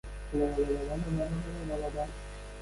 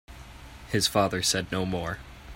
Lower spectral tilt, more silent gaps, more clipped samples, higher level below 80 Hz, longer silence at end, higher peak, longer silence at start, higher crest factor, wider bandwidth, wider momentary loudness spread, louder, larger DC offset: first, -7 dB/octave vs -3.5 dB/octave; neither; neither; first, -40 dBFS vs -48 dBFS; about the same, 0 s vs 0 s; second, -18 dBFS vs -10 dBFS; about the same, 0.05 s vs 0.1 s; second, 14 dB vs 20 dB; second, 11.5 kHz vs 16.5 kHz; second, 9 LU vs 22 LU; second, -34 LUFS vs -27 LUFS; neither